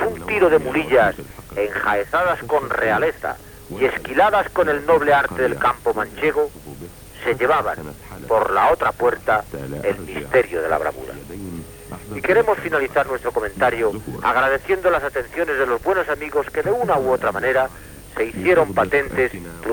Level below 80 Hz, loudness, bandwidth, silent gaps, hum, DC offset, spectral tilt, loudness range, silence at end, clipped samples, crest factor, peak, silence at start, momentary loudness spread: -44 dBFS; -19 LUFS; over 20 kHz; none; none; under 0.1%; -5.5 dB/octave; 3 LU; 0 s; under 0.1%; 16 dB; -4 dBFS; 0 s; 16 LU